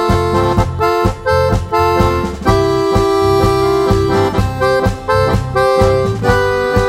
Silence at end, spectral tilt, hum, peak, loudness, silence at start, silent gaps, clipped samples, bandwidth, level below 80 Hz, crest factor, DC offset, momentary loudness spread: 0 s; -6.5 dB/octave; none; 0 dBFS; -13 LUFS; 0 s; none; under 0.1%; 16 kHz; -24 dBFS; 12 dB; under 0.1%; 3 LU